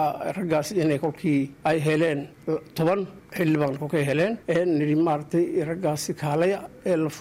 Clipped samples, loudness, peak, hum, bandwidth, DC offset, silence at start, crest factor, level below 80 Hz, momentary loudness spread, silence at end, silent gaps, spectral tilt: under 0.1%; -25 LUFS; -12 dBFS; none; 16 kHz; under 0.1%; 0 s; 12 dB; -60 dBFS; 6 LU; 0 s; none; -6.5 dB/octave